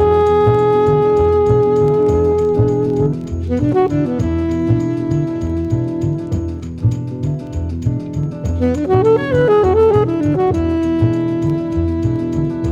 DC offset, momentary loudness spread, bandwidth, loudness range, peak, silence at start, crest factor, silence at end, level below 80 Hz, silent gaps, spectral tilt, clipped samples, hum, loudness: under 0.1%; 9 LU; 7.8 kHz; 6 LU; -2 dBFS; 0 s; 12 dB; 0 s; -34 dBFS; none; -9 dB/octave; under 0.1%; none; -16 LUFS